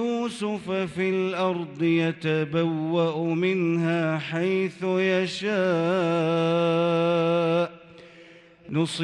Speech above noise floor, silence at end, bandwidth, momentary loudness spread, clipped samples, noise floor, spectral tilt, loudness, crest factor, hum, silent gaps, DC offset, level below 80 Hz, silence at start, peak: 26 dB; 0 s; 11 kHz; 5 LU; under 0.1%; -50 dBFS; -6.5 dB/octave; -25 LUFS; 12 dB; none; none; under 0.1%; -68 dBFS; 0 s; -12 dBFS